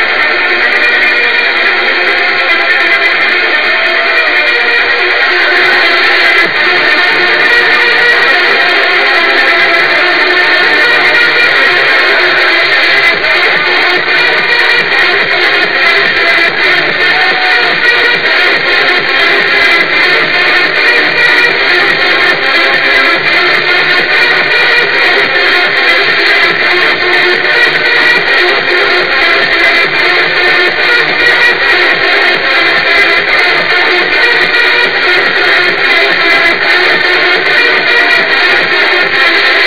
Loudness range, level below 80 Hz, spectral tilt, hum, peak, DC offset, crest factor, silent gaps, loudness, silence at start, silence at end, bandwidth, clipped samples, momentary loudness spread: 1 LU; -44 dBFS; -3 dB/octave; none; 0 dBFS; 4%; 8 dB; none; -6 LUFS; 0 s; 0 s; 5.4 kHz; 2%; 2 LU